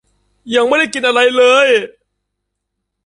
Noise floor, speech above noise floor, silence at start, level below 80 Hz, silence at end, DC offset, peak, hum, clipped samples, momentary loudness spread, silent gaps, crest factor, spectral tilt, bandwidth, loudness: -75 dBFS; 63 dB; 0.45 s; -60 dBFS; 1.2 s; under 0.1%; 0 dBFS; 50 Hz at -55 dBFS; under 0.1%; 8 LU; none; 14 dB; -2 dB/octave; 11 kHz; -12 LUFS